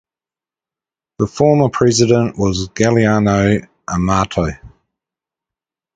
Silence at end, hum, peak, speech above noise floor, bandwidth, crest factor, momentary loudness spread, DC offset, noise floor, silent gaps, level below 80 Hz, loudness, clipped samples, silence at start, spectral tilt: 1.3 s; none; 0 dBFS; over 76 dB; 9.4 kHz; 16 dB; 9 LU; under 0.1%; under -90 dBFS; none; -38 dBFS; -15 LUFS; under 0.1%; 1.2 s; -5.5 dB/octave